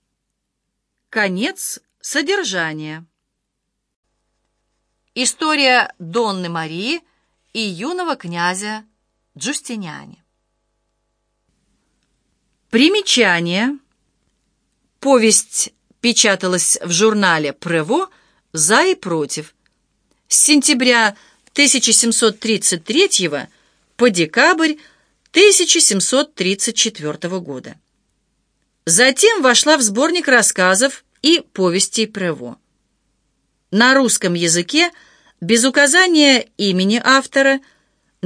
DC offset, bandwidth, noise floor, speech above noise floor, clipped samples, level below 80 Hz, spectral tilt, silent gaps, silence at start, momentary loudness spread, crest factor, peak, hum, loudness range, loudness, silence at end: under 0.1%; 11 kHz; -75 dBFS; 60 dB; under 0.1%; -68 dBFS; -2 dB/octave; 3.96-4.03 s; 1.15 s; 14 LU; 18 dB; 0 dBFS; none; 10 LU; -14 LUFS; 0 s